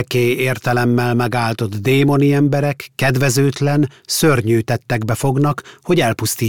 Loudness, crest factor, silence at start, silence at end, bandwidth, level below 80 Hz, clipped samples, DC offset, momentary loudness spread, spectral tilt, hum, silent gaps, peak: -16 LUFS; 12 dB; 0 s; 0 s; 18 kHz; -48 dBFS; under 0.1%; 0.7%; 6 LU; -5.5 dB/octave; none; none; -4 dBFS